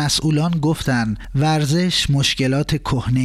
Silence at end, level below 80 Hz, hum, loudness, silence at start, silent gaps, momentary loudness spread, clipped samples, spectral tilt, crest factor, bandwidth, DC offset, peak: 0 s; -36 dBFS; none; -18 LUFS; 0 s; none; 4 LU; under 0.1%; -5 dB/octave; 12 dB; 14.5 kHz; under 0.1%; -6 dBFS